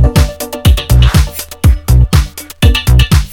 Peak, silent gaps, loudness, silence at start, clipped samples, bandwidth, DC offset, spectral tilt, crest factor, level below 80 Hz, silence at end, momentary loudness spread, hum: 0 dBFS; none; -11 LUFS; 0 s; 0.5%; 18 kHz; under 0.1%; -5 dB/octave; 8 dB; -12 dBFS; 0 s; 5 LU; none